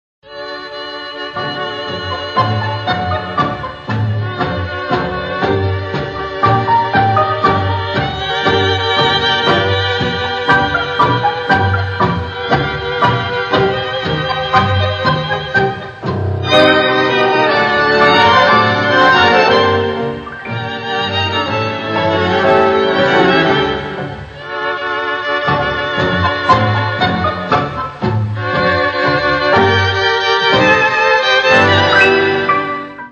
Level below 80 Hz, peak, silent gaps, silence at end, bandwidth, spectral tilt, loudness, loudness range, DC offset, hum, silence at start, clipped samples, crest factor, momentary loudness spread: -42 dBFS; 0 dBFS; none; 0 s; 8.4 kHz; -5.5 dB/octave; -13 LUFS; 7 LU; under 0.1%; none; 0.25 s; under 0.1%; 14 dB; 12 LU